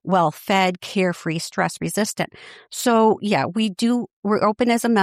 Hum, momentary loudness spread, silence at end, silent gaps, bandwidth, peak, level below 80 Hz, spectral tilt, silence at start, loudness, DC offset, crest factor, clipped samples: none; 7 LU; 0 s; 4.13-4.23 s; 15.5 kHz; -6 dBFS; -62 dBFS; -5 dB/octave; 0.05 s; -21 LUFS; under 0.1%; 14 dB; under 0.1%